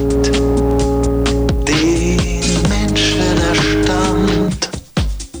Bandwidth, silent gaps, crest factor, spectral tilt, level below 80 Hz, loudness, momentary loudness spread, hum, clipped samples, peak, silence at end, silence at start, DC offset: over 20 kHz; none; 12 dB; -5 dB/octave; -22 dBFS; -15 LUFS; 7 LU; none; under 0.1%; -4 dBFS; 0 s; 0 s; under 0.1%